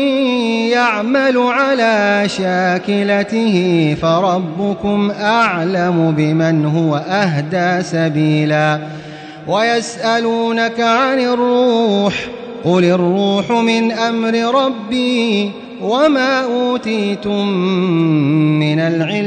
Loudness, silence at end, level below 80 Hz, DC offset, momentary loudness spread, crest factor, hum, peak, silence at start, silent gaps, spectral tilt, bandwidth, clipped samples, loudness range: -15 LUFS; 0 s; -54 dBFS; under 0.1%; 5 LU; 12 dB; none; -4 dBFS; 0 s; none; -6 dB/octave; 9 kHz; under 0.1%; 2 LU